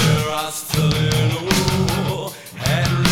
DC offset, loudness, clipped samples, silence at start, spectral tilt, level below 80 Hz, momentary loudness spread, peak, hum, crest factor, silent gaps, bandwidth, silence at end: under 0.1%; -19 LUFS; under 0.1%; 0 s; -4.5 dB/octave; -38 dBFS; 7 LU; 0 dBFS; none; 18 dB; none; 17.5 kHz; 0 s